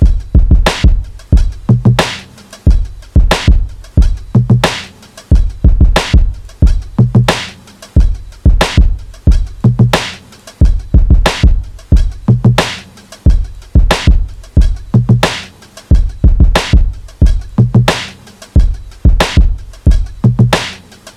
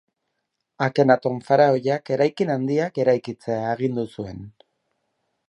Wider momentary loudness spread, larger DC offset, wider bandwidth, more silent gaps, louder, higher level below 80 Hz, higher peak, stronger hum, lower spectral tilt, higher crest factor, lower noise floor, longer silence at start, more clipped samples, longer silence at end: second, 8 LU vs 11 LU; neither; first, 12.5 kHz vs 11 kHz; neither; first, -12 LUFS vs -22 LUFS; first, -12 dBFS vs -62 dBFS; about the same, 0 dBFS vs -2 dBFS; neither; second, -6 dB/octave vs -7.5 dB/octave; second, 10 dB vs 20 dB; second, -34 dBFS vs -78 dBFS; second, 0 s vs 0.8 s; neither; second, 0.05 s vs 1 s